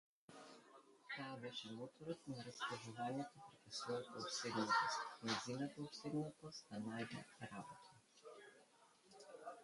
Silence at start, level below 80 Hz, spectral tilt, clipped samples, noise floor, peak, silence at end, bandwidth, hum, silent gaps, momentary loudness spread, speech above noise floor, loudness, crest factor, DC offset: 0.3 s; -86 dBFS; -4 dB/octave; under 0.1%; -71 dBFS; -26 dBFS; 0 s; 11.5 kHz; none; none; 20 LU; 24 dB; -47 LUFS; 22 dB; under 0.1%